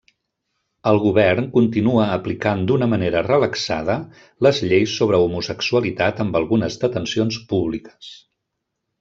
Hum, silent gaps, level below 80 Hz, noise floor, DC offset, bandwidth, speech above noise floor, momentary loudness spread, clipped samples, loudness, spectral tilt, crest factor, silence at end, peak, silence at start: none; none; -52 dBFS; -78 dBFS; under 0.1%; 7.6 kHz; 59 dB; 8 LU; under 0.1%; -19 LUFS; -6 dB/octave; 18 dB; 0.85 s; -2 dBFS; 0.85 s